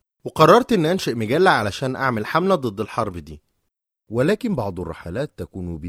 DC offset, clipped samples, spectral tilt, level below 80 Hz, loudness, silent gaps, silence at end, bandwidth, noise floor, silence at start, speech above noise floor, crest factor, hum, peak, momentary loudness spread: under 0.1%; under 0.1%; -6 dB/octave; -48 dBFS; -20 LUFS; none; 0 s; 16 kHz; -76 dBFS; 0.25 s; 56 dB; 20 dB; none; 0 dBFS; 16 LU